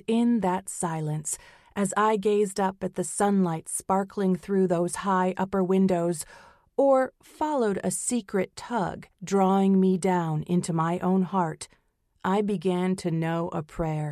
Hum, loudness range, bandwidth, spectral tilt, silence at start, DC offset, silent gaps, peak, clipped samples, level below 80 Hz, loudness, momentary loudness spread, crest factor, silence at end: none; 2 LU; 14 kHz; -6 dB/octave; 0.1 s; under 0.1%; none; -10 dBFS; under 0.1%; -58 dBFS; -26 LUFS; 9 LU; 16 dB; 0 s